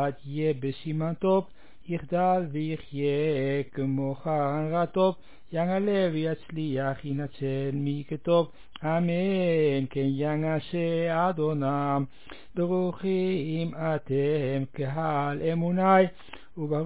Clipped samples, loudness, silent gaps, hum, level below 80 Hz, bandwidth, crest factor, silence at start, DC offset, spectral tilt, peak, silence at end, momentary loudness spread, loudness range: under 0.1%; -28 LUFS; none; none; -62 dBFS; 4 kHz; 18 dB; 0 s; 0.7%; -11.5 dB/octave; -10 dBFS; 0 s; 7 LU; 2 LU